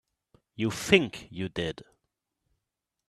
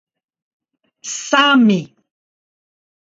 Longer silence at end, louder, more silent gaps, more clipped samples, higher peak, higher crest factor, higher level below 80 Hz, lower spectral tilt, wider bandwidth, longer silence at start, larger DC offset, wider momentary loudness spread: about the same, 1.25 s vs 1.2 s; second, -28 LUFS vs -14 LUFS; neither; neither; about the same, -2 dBFS vs 0 dBFS; first, 30 dB vs 18 dB; first, -60 dBFS vs -70 dBFS; about the same, -4.5 dB/octave vs -3.5 dB/octave; first, 14.5 kHz vs 7.8 kHz; second, 0.6 s vs 1.05 s; neither; second, 13 LU vs 16 LU